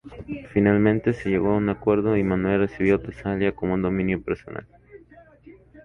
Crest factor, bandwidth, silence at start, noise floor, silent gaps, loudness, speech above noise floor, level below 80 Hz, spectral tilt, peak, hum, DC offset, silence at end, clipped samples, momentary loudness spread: 18 dB; 6.8 kHz; 0.05 s; -51 dBFS; none; -23 LUFS; 29 dB; -46 dBFS; -9.5 dB/octave; -6 dBFS; none; under 0.1%; 0.05 s; under 0.1%; 11 LU